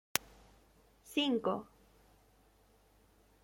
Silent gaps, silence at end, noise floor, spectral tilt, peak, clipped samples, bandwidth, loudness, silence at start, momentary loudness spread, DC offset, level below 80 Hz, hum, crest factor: none; 1.8 s; -68 dBFS; -3 dB/octave; -6 dBFS; under 0.1%; 16.5 kHz; -36 LUFS; 0.15 s; 10 LU; under 0.1%; -70 dBFS; none; 34 dB